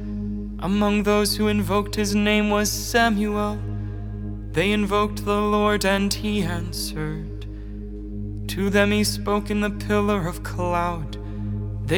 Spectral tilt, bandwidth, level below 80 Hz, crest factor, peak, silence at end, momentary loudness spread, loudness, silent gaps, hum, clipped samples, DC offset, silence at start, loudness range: -5 dB/octave; 19.5 kHz; -34 dBFS; 20 dB; -4 dBFS; 0 s; 13 LU; -23 LUFS; none; none; under 0.1%; under 0.1%; 0 s; 4 LU